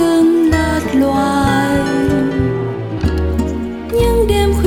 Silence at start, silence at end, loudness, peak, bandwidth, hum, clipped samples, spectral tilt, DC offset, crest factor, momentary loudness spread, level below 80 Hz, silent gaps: 0 s; 0 s; -15 LUFS; -2 dBFS; 17.5 kHz; none; under 0.1%; -6.5 dB/octave; under 0.1%; 12 dB; 8 LU; -24 dBFS; none